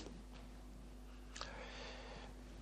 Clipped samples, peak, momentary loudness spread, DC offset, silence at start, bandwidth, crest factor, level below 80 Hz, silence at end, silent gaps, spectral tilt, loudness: under 0.1%; -28 dBFS; 8 LU; under 0.1%; 0 s; 14.5 kHz; 24 dB; -56 dBFS; 0 s; none; -4 dB/octave; -53 LUFS